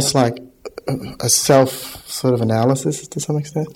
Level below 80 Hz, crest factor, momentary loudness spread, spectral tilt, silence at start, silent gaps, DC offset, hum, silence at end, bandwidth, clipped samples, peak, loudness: -52 dBFS; 18 dB; 15 LU; -4.5 dB/octave; 0 s; none; under 0.1%; none; 0 s; 17 kHz; under 0.1%; 0 dBFS; -18 LUFS